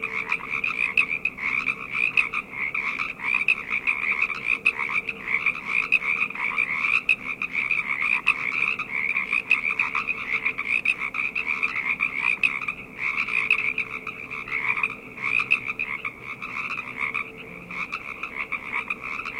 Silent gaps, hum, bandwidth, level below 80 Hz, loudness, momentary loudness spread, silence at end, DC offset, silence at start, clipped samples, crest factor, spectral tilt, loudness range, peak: none; none; 16 kHz; -58 dBFS; -24 LUFS; 9 LU; 0 s; under 0.1%; 0 s; under 0.1%; 20 dB; -3 dB/octave; 4 LU; -6 dBFS